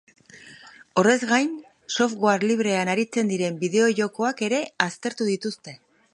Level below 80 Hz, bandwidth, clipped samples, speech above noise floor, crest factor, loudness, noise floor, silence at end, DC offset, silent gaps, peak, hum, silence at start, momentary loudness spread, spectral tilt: -72 dBFS; 11 kHz; under 0.1%; 25 dB; 22 dB; -23 LUFS; -48 dBFS; 0.35 s; under 0.1%; none; 0 dBFS; none; 0.35 s; 9 LU; -4.5 dB/octave